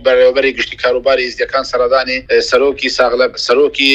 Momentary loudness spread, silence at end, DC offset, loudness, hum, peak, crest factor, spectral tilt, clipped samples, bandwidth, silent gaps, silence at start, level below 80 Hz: 5 LU; 0 s; under 0.1%; -13 LUFS; none; 0 dBFS; 12 dB; -2.5 dB/octave; under 0.1%; 9.4 kHz; none; 0 s; -42 dBFS